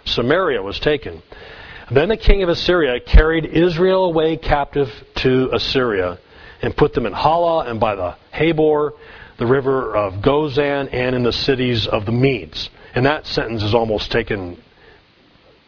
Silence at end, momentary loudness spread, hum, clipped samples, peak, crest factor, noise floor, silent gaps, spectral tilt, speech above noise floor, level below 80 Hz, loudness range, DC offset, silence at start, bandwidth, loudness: 1.1 s; 10 LU; none; under 0.1%; 0 dBFS; 18 dB; -51 dBFS; none; -7 dB/octave; 34 dB; -26 dBFS; 2 LU; under 0.1%; 0.05 s; 5.4 kHz; -18 LUFS